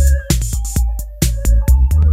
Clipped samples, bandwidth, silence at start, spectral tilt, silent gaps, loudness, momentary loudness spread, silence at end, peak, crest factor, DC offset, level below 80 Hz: under 0.1%; 16 kHz; 0 s; -5 dB/octave; none; -16 LUFS; 6 LU; 0 s; 0 dBFS; 12 dB; under 0.1%; -14 dBFS